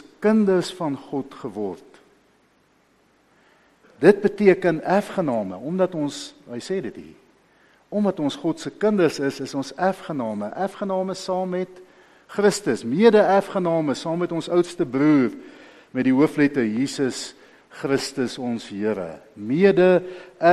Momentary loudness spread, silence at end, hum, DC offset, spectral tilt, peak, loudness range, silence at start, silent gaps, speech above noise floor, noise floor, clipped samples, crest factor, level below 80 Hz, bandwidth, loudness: 15 LU; 0 s; none; under 0.1%; -6 dB/octave; 0 dBFS; 7 LU; 0.2 s; none; 40 dB; -61 dBFS; under 0.1%; 22 dB; -64 dBFS; 13 kHz; -22 LUFS